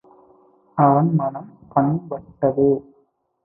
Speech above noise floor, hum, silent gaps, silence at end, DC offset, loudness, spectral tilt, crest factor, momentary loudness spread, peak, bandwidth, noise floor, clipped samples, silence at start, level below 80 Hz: 44 dB; none; none; 0.65 s; under 0.1%; -20 LUFS; -15 dB/octave; 18 dB; 14 LU; -2 dBFS; 2.7 kHz; -63 dBFS; under 0.1%; 0.75 s; -56 dBFS